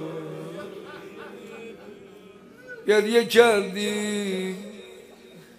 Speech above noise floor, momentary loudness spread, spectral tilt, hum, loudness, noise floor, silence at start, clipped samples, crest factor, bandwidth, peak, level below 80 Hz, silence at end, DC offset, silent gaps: 27 dB; 25 LU; -4 dB/octave; none; -22 LUFS; -48 dBFS; 0 s; under 0.1%; 24 dB; 15.5 kHz; -2 dBFS; -68 dBFS; 0.2 s; under 0.1%; none